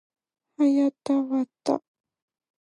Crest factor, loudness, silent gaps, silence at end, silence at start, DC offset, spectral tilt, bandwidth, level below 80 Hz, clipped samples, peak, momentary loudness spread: 18 dB; -25 LUFS; none; 0.85 s; 0.6 s; under 0.1%; -5.5 dB/octave; 11 kHz; -80 dBFS; under 0.1%; -10 dBFS; 7 LU